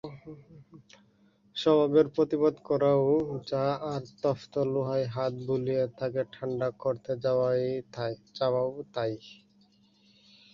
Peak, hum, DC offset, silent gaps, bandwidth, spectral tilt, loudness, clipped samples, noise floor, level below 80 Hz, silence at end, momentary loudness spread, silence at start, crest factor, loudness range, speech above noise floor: -10 dBFS; none; under 0.1%; none; 7.4 kHz; -7.5 dB/octave; -29 LUFS; under 0.1%; -64 dBFS; -66 dBFS; 1.2 s; 11 LU; 0.05 s; 18 dB; 5 LU; 36 dB